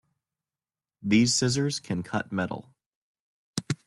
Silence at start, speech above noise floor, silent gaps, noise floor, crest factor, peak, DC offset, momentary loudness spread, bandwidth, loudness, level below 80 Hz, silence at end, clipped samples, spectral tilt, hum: 1 s; over 64 dB; 2.86-3.54 s; under -90 dBFS; 20 dB; -10 dBFS; under 0.1%; 15 LU; 12 kHz; -27 LUFS; -62 dBFS; 0.1 s; under 0.1%; -4 dB/octave; none